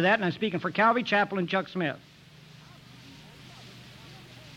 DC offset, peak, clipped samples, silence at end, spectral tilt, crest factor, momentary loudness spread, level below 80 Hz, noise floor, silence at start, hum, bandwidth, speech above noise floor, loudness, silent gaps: under 0.1%; -14 dBFS; under 0.1%; 0 s; -6 dB/octave; 16 dB; 25 LU; -68 dBFS; -52 dBFS; 0 s; none; 15 kHz; 25 dB; -26 LUFS; none